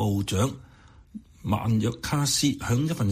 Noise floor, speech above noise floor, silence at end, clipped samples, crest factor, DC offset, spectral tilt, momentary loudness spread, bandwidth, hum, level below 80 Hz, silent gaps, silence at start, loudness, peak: -45 dBFS; 20 dB; 0 s; under 0.1%; 14 dB; under 0.1%; -5 dB/octave; 22 LU; 15.5 kHz; none; -48 dBFS; none; 0 s; -26 LUFS; -12 dBFS